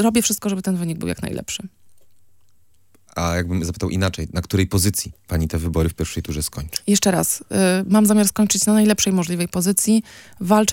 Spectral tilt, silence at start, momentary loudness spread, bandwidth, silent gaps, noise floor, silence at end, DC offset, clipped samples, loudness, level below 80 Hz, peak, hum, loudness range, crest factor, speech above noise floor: -4.5 dB/octave; 0 s; 11 LU; 17 kHz; none; -62 dBFS; 0 s; under 0.1%; under 0.1%; -20 LUFS; -40 dBFS; 0 dBFS; none; 9 LU; 20 dB; 43 dB